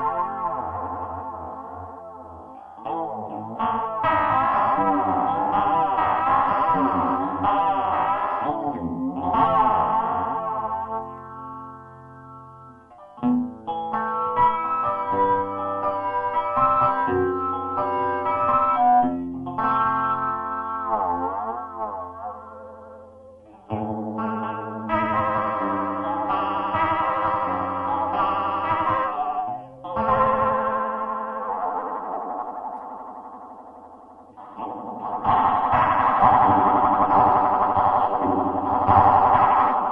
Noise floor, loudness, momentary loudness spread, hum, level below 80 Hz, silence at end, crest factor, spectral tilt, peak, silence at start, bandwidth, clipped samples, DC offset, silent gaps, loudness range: -47 dBFS; -22 LUFS; 17 LU; none; -52 dBFS; 0 s; 20 dB; -9 dB/octave; -2 dBFS; 0 s; 5.4 kHz; under 0.1%; under 0.1%; none; 12 LU